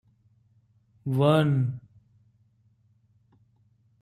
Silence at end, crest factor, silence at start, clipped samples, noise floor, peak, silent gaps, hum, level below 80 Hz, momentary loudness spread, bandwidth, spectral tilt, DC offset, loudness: 2.25 s; 22 dB; 1.05 s; under 0.1%; -65 dBFS; -8 dBFS; none; none; -66 dBFS; 17 LU; 13.5 kHz; -8.5 dB/octave; under 0.1%; -25 LUFS